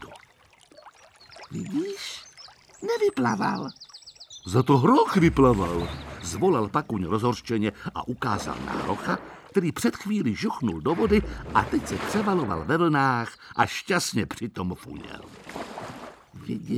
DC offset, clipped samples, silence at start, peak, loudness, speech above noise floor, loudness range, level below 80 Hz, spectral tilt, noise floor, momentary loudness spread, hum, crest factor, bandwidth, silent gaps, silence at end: under 0.1%; under 0.1%; 0 s; -6 dBFS; -25 LUFS; 32 dB; 7 LU; -46 dBFS; -6 dB/octave; -57 dBFS; 19 LU; none; 20 dB; 16.5 kHz; none; 0 s